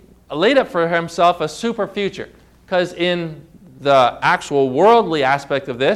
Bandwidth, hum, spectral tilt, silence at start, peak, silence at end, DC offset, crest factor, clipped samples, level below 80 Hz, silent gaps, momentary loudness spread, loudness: 13.5 kHz; none; -5 dB/octave; 0.3 s; -4 dBFS; 0 s; under 0.1%; 14 dB; under 0.1%; -52 dBFS; none; 11 LU; -17 LUFS